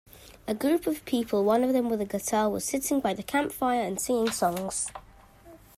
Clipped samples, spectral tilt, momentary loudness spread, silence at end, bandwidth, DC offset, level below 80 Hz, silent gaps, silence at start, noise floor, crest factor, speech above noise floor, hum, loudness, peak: under 0.1%; -4 dB/octave; 7 LU; 0.2 s; 16 kHz; under 0.1%; -58 dBFS; none; 0.15 s; -52 dBFS; 16 dB; 25 dB; none; -27 LUFS; -12 dBFS